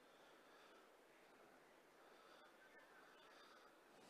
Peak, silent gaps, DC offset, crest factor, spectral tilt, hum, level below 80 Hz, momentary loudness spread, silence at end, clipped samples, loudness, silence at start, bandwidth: -54 dBFS; none; under 0.1%; 14 dB; -2.5 dB/octave; none; under -90 dBFS; 4 LU; 0 s; under 0.1%; -67 LUFS; 0 s; 15 kHz